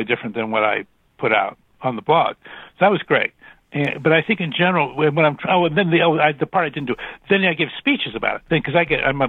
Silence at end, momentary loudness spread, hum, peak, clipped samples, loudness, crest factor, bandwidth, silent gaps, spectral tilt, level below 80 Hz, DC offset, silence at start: 0 s; 9 LU; none; -2 dBFS; under 0.1%; -19 LUFS; 18 dB; 4.2 kHz; none; -8 dB/octave; -52 dBFS; under 0.1%; 0 s